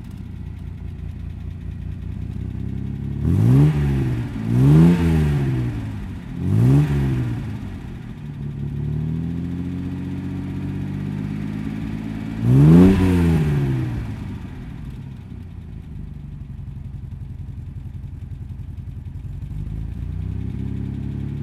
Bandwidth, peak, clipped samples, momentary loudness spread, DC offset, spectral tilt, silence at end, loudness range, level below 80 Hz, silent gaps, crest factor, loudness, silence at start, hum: 13 kHz; -2 dBFS; under 0.1%; 19 LU; under 0.1%; -9 dB/octave; 0 s; 16 LU; -34 dBFS; none; 20 dB; -21 LUFS; 0 s; none